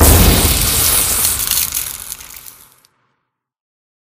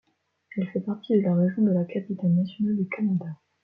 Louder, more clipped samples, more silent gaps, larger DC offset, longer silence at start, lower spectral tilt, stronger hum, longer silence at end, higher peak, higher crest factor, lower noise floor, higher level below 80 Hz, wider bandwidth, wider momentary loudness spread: first, -12 LUFS vs -26 LUFS; neither; neither; neither; second, 0 s vs 0.55 s; second, -3 dB/octave vs -11.5 dB/octave; neither; first, 1.6 s vs 0.3 s; first, 0 dBFS vs -10 dBFS; about the same, 16 dB vs 16 dB; first, -71 dBFS vs -54 dBFS; first, -22 dBFS vs -70 dBFS; first, 16.5 kHz vs 4.7 kHz; first, 19 LU vs 9 LU